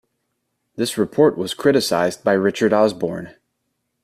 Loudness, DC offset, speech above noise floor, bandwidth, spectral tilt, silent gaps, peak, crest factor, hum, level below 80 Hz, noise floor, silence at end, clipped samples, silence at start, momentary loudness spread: -19 LUFS; under 0.1%; 56 dB; 15 kHz; -5 dB/octave; none; -4 dBFS; 16 dB; none; -60 dBFS; -74 dBFS; 0.75 s; under 0.1%; 0.8 s; 10 LU